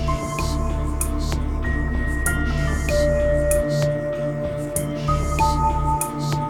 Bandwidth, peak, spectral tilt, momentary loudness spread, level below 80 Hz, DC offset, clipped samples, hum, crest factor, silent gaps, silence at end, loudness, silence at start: 17.5 kHz; -6 dBFS; -5.5 dB/octave; 5 LU; -26 dBFS; under 0.1%; under 0.1%; none; 16 dB; none; 0 s; -22 LUFS; 0 s